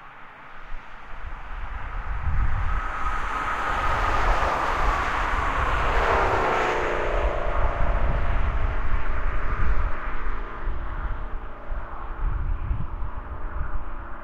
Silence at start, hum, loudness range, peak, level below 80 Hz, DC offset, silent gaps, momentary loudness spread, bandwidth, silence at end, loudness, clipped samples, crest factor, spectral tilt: 0 s; none; 10 LU; -8 dBFS; -26 dBFS; under 0.1%; none; 15 LU; 8 kHz; 0 s; -27 LUFS; under 0.1%; 14 dB; -6 dB/octave